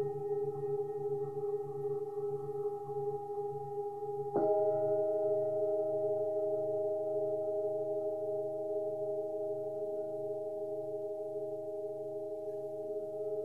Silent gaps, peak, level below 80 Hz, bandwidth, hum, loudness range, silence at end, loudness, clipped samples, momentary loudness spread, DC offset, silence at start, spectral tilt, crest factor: none; -20 dBFS; -74 dBFS; 2 kHz; none; 6 LU; 0 s; -36 LUFS; under 0.1%; 8 LU; 0.1%; 0 s; -9.5 dB/octave; 16 dB